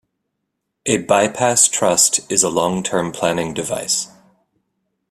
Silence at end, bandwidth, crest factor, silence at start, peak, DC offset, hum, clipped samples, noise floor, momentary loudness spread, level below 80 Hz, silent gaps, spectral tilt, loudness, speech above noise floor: 1.05 s; 15.5 kHz; 20 dB; 0.85 s; 0 dBFS; under 0.1%; none; under 0.1%; -76 dBFS; 9 LU; -56 dBFS; none; -2.5 dB/octave; -16 LUFS; 58 dB